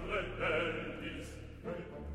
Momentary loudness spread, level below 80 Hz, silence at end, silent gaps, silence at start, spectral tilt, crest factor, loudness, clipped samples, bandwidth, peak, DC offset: 12 LU; -50 dBFS; 0 s; none; 0 s; -5.5 dB/octave; 16 dB; -39 LUFS; under 0.1%; 14 kHz; -22 dBFS; under 0.1%